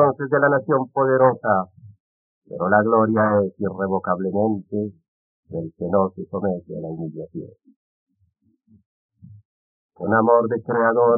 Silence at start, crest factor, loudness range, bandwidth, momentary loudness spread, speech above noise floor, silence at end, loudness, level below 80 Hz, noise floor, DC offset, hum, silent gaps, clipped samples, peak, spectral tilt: 0 s; 18 dB; 13 LU; 2.4 kHz; 15 LU; 45 dB; 0 s; -21 LUFS; -64 dBFS; -65 dBFS; under 0.1%; none; 2.00-2.42 s, 5.08-5.43 s, 7.76-8.07 s, 8.86-9.09 s, 9.45-9.89 s; under 0.1%; -2 dBFS; -2.5 dB/octave